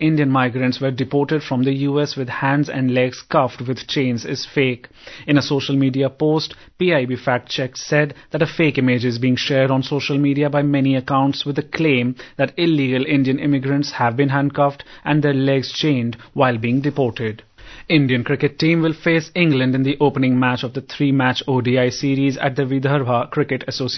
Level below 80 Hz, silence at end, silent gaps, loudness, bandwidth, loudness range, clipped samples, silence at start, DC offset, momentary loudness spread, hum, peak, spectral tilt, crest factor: -54 dBFS; 0 s; none; -19 LUFS; 6.4 kHz; 2 LU; under 0.1%; 0 s; under 0.1%; 6 LU; none; -2 dBFS; -6.5 dB/octave; 16 dB